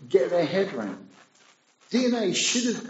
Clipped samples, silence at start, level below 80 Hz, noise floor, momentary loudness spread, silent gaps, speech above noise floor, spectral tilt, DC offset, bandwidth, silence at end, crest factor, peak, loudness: under 0.1%; 0 s; -80 dBFS; -60 dBFS; 12 LU; none; 35 dB; -3 dB/octave; under 0.1%; 8.2 kHz; 0 s; 18 dB; -8 dBFS; -25 LUFS